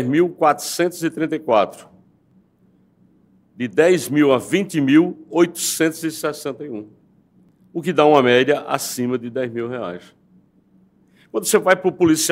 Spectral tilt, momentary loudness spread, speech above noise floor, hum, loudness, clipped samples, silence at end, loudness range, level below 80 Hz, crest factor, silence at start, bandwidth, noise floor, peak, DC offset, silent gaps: -4.5 dB/octave; 14 LU; 39 dB; none; -18 LUFS; under 0.1%; 0 s; 5 LU; -66 dBFS; 20 dB; 0 s; 16 kHz; -57 dBFS; 0 dBFS; under 0.1%; none